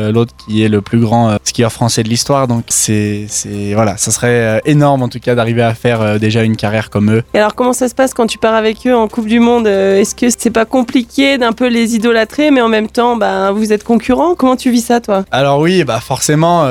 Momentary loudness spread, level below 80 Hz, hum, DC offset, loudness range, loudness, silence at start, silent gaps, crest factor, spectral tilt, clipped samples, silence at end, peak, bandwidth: 4 LU; -42 dBFS; none; under 0.1%; 1 LU; -12 LUFS; 0 s; none; 12 dB; -5 dB/octave; under 0.1%; 0 s; 0 dBFS; 18.5 kHz